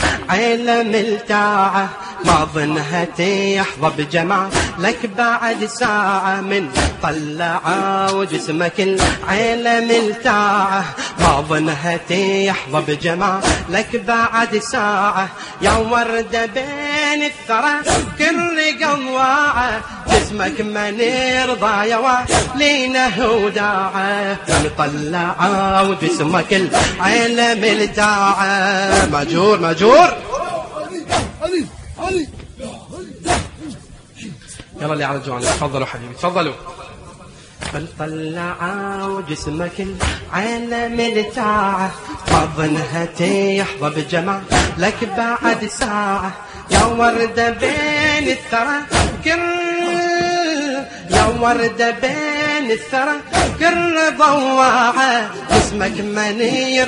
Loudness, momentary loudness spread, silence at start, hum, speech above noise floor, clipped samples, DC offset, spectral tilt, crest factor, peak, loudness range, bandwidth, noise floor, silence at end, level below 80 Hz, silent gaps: -16 LUFS; 9 LU; 0 s; none; 23 dB; under 0.1%; under 0.1%; -4 dB/octave; 16 dB; 0 dBFS; 8 LU; 11 kHz; -39 dBFS; 0 s; -36 dBFS; none